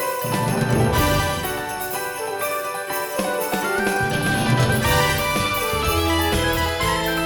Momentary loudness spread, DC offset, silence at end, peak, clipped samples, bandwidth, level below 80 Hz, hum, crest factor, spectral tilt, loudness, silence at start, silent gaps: 7 LU; under 0.1%; 0 s; -6 dBFS; under 0.1%; over 20 kHz; -34 dBFS; none; 14 dB; -4 dB/octave; -21 LUFS; 0 s; none